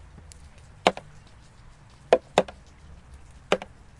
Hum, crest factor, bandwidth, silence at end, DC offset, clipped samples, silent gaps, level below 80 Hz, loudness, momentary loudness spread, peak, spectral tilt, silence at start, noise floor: none; 28 dB; 11.5 kHz; 0.35 s; under 0.1%; under 0.1%; none; -52 dBFS; -26 LUFS; 26 LU; -2 dBFS; -4 dB/octave; 0.85 s; -50 dBFS